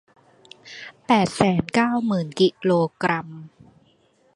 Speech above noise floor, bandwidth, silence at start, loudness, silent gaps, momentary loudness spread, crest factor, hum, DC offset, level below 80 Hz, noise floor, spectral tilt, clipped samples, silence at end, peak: 40 dB; 11.5 kHz; 0.65 s; -21 LUFS; none; 19 LU; 22 dB; none; under 0.1%; -56 dBFS; -61 dBFS; -6 dB/octave; under 0.1%; 0.9 s; -2 dBFS